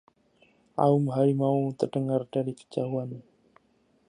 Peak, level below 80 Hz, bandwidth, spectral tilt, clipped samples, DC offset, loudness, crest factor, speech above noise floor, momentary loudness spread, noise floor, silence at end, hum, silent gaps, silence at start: -8 dBFS; -74 dBFS; 10.5 kHz; -9 dB/octave; under 0.1%; under 0.1%; -27 LUFS; 20 dB; 41 dB; 11 LU; -67 dBFS; 0.9 s; none; none; 0.75 s